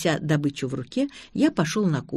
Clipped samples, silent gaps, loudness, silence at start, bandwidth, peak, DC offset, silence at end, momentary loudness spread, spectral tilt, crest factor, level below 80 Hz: under 0.1%; none; -25 LUFS; 0 s; 13.5 kHz; -8 dBFS; under 0.1%; 0 s; 7 LU; -6 dB/octave; 16 dB; -58 dBFS